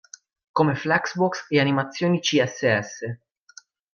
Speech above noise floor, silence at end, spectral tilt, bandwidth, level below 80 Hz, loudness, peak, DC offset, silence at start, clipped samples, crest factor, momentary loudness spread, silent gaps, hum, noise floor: 29 dB; 0.75 s; -5 dB/octave; 7.2 kHz; -68 dBFS; -22 LUFS; -6 dBFS; under 0.1%; 0.55 s; under 0.1%; 18 dB; 12 LU; none; none; -52 dBFS